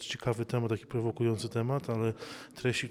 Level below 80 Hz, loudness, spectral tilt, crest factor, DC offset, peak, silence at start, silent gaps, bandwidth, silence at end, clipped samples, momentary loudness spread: -64 dBFS; -33 LUFS; -6 dB/octave; 16 dB; under 0.1%; -16 dBFS; 0 s; none; 14.5 kHz; 0 s; under 0.1%; 4 LU